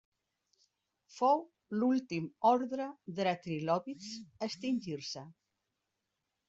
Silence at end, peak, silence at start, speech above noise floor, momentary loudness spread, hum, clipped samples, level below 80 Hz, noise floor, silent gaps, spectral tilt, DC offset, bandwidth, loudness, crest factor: 1.15 s; -16 dBFS; 1.1 s; 52 dB; 13 LU; none; under 0.1%; -78 dBFS; -86 dBFS; none; -5.5 dB/octave; under 0.1%; 7.8 kHz; -34 LUFS; 20 dB